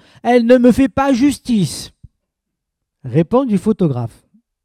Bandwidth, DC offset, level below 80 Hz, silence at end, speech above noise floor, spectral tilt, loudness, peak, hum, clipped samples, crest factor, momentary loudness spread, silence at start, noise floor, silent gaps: 14.5 kHz; under 0.1%; -44 dBFS; 0.55 s; 64 dB; -6.5 dB/octave; -14 LUFS; 0 dBFS; none; under 0.1%; 16 dB; 17 LU; 0.25 s; -78 dBFS; none